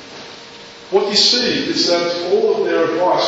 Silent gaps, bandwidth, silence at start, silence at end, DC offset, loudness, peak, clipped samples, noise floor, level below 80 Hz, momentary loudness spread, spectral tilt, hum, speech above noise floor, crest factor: none; 8 kHz; 0 s; 0 s; under 0.1%; -15 LUFS; -2 dBFS; under 0.1%; -37 dBFS; -58 dBFS; 22 LU; -2.5 dB/octave; none; 21 dB; 16 dB